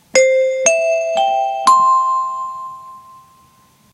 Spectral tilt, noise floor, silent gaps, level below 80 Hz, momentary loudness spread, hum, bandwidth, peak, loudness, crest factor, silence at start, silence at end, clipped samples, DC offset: 0 dB/octave; -51 dBFS; none; -66 dBFS; 16 LU; none; 14.5 kHz; 0 dBFS; -14 LUFS; 16 dB; 0.15 s; 0.95 s; under 0.1%; under 0.1%